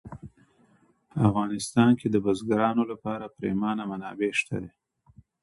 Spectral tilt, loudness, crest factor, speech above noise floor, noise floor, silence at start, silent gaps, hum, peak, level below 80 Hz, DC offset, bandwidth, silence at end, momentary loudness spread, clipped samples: -6.5 dB/octave; -26 LUFS; 18 dB; 38 dB; -63 dBFS; 0.05 s; none; none; -8 dBFS; -58 dBFS; under 0.1%; 11.5 kHz; 0.75 s; 14 LU; under 0.1%